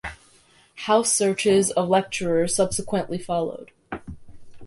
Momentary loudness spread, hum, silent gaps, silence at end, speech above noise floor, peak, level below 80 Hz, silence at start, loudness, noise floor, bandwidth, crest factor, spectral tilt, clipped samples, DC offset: 18 LU; none; none; 0 s; 35 dB; -4 dBFS; -50 dBFS; 0.05 s; -22 LUFS; -56 dBFS; 11.5 kHz; 18 dB; -3.5 dB/octave; under 0.1%; under 0.1%